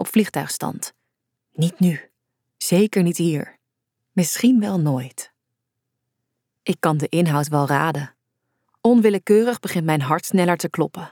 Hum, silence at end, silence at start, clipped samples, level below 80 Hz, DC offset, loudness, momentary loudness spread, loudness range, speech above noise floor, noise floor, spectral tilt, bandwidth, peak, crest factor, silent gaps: none; 0.05 s; 0 s; under 0.1%; -70 dBFS; under 0.1%; -20 LUFS; 15 LU; 4 LU; 60 dB; -79 dBFS; -6 dB/octave; 18.5 kHz; -4 dBFS; 18 dB; none